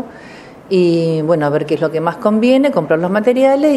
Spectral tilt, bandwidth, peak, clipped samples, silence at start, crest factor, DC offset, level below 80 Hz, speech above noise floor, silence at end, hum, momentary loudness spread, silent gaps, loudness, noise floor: -7.5 dB/octave; 12.5 kHz; 0 dBFS; under 0.1%; 0 s; 14 dB; under 0.1%; -58 dBFS; 23 dB; 0 s; none; 5 LU; none; -14 LUFS; -36 dBFS